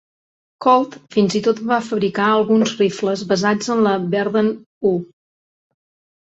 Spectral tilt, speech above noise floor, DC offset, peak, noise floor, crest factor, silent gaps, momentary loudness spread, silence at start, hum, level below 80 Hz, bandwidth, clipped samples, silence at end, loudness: -5.5 dB/octave; over 73 dB; under 0.1%; -2 dBFS; under -90 dBFS; 16 dB; 4.66-4.81 s; 6 LU; 0.6 s; none; -62 dBFS; 8 kHz; under 0.1%; 1.25 s; -18 LUFS